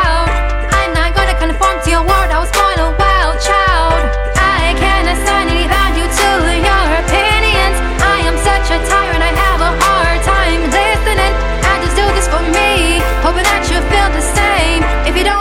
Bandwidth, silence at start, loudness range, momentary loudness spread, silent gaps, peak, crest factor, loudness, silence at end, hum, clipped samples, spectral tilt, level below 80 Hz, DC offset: 16 kHz; 0 s; 1 LU; 3 LU; none; 0 dBFS; 12 dB; -12 LUFS; 0 s; none; under 0.1%; -4 dB/octave; -16 dBFS; under 0.1%